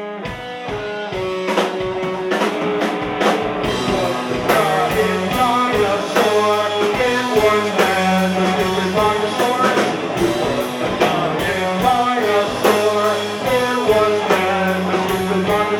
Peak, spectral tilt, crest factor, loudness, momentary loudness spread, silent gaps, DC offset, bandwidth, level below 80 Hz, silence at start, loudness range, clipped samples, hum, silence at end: -2 dBFS; -4.5 dB/octave; 16 dB; -17 LUFS; 6 LU; none; under 0.1%; 19 kHz; -44 dBFS; 0 s; 3 LU; under 0.1%; none; 0 s